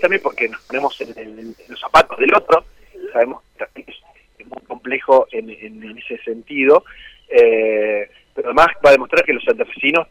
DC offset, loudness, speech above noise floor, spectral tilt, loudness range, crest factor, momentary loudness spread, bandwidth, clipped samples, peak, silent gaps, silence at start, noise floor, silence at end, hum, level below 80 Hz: under 0.1%; -15 LUFS; 31 dB; -4.5 dB/octave; 7 LU; 16 dB; 21 LU; 13 kHz; under 0.1%; -2 dBFS; none; 0 s; -47 dBFS; 0.05 s; none; -48 dBFS